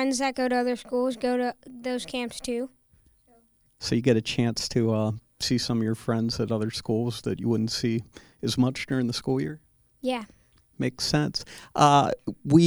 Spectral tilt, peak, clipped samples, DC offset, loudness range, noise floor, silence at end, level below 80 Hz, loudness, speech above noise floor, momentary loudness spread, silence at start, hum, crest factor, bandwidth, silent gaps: -5.5 dB/octave; -2 dBFS; under 0.1%; under 0.1%; 3 LU; -62 dBFS; 0 s; -54 dBFS; -27 LUFS; 37 dB; 11 LU; 0 s; none; 24 dB; over 20 kHz; none